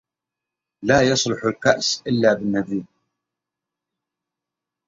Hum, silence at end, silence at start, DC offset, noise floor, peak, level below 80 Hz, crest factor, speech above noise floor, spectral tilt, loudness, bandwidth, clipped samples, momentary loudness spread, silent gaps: none; 2 s; 0.8 s; under 0.1%; -86 dBFS; -2 dBFS; -54 dBFS; 20 dB; 66 dB; -4 dB/octave; -20 LUFS; 8 kHz; under 0.1%; 11 LU; none